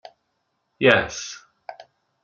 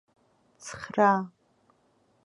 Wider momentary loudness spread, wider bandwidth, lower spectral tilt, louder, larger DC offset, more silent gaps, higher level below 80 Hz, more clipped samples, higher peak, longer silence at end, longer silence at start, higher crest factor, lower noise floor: first, 25 LU vs 20 LU; second, 7.6 kHz vs 11.5 kHz; second, -3.5 dB/octave vs -5.5 dB/octave; first, -20 LUFS vs -25 LUFS; neither; neither; first, -56 dBFS vs -70 dBFS; neither; first, 0 dBFS vs -8 dBFS; second, 0.5 s vs 0.95 s; first, 0.8 s vs 0.65 s; about the same, 26 dB vs 22 dB; first, -74 dBFS vs -67 dBFS